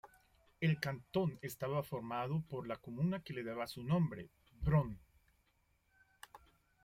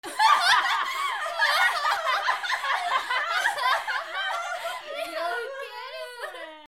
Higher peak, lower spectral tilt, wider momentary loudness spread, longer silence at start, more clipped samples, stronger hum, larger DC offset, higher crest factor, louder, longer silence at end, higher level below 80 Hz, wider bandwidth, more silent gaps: second, -20 dBFS vs -8 dBFS; first, -7.5 dB/octave vs 1.5 dB/octave; first, 20 LU vs 16 LU; about the same, 0.05 s vs 0.05 s; neither; neither; neither; about the same, 20 dB vs 18 dB; second, -39 LUFS vs -25 LUFS; first, 0.45 s vs 0 s; first, -58 dBFS vs -72 dBFS; about the same, 16.5 kHz vs 18 kHz; neither